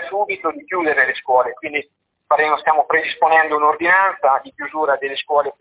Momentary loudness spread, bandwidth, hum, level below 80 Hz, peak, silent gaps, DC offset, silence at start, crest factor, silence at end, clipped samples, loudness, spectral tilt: 9 LU; 4 kHz; none; -64 dBFS; -2 dBFS; none; under 0.1%; 0 s; 16 dB; 0.1 s; under 0.1%; -17 LUFS; -6 dB/octave